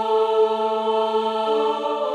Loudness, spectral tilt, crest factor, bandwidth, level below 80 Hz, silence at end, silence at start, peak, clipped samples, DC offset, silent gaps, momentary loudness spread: -21 LUFS; -4.5 dB/octave; 12 dB; 9.2 kHz; -78 dBFS; 0 s; 0 s; -10 dBFS; under 0.1%; under 0.1%; none; 3 LU